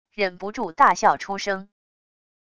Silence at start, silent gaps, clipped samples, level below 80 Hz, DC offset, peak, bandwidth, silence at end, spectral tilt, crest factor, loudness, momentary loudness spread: 0.2 s; none; under 0.1%; -60 dBFS; under 0.1%; -4 dBFS; 10.5 kHz; 0.75 s; -3.5 dB/octave; 20 dB; -22 LUFS; 13 LU